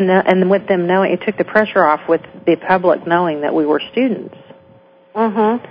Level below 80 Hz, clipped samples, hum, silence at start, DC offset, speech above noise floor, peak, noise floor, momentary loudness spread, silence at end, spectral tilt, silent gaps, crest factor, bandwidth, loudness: -58 dBFS; under 0.1%; none; 0 s; under 0.1%; 32 dB; 0 dBFS; -47 dBFS; 6 LU; 0.05 s; -9 dB/octave; none; 16 dB; 5.2 kHz; -15 LUFS